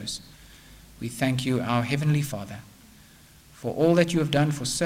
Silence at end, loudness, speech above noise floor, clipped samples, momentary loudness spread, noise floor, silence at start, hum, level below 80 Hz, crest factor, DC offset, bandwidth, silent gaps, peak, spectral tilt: 0 s; -25 LUFS; 28 dB; under 0.1%; 15 LU; -52 dBFS; 0 s; none; -54 dBFS; 20 dB; under 0.1%; 16 kHz; none; -8 dBFS; -5.5 dB/octave